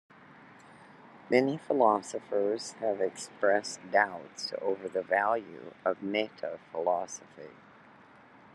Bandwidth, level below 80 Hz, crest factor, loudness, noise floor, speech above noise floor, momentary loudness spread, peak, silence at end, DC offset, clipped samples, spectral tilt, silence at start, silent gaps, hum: 12 kHz; -82 dBFS; 22 dB; -31 LUFS; -56 dBFS; 25 dB; 12 LU; -10 dBFS; 1 s; under 0.1%; under 0.1%; -4 dB/octave; 0.3 s; none; none